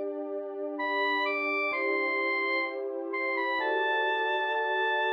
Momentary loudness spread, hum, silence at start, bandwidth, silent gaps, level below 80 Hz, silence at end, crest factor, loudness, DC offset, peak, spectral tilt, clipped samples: 8 LU; none; 0 s; 6.6 kHz; none; -84 dBFS; 0 s; 12 dB; -28 LUFS; under 0.1%; -18 dBFS; -2.5 dB/octave; under 0.1%